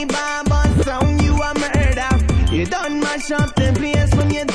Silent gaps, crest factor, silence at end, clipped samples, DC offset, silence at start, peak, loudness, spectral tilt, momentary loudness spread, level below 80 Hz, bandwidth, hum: none; 14 dB; 0 s; under 0.1%; under 0.1%; 0 s; -2 dBFS; -18 LUFS; -5.5 dB/octave; 4 LU; -22 dBFS; 11 kHz; none